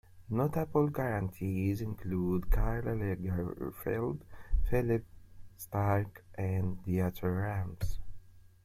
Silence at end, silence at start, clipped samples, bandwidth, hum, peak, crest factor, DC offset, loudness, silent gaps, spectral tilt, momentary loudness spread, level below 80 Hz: 0.2 s; 0.15 s; under 0.1%; 16 kHz; none; -16 dBFS; 16 dB; under 0.1%; -34 LUFS; none; -8.5 dB/octave; 8 LU; -40 dBFS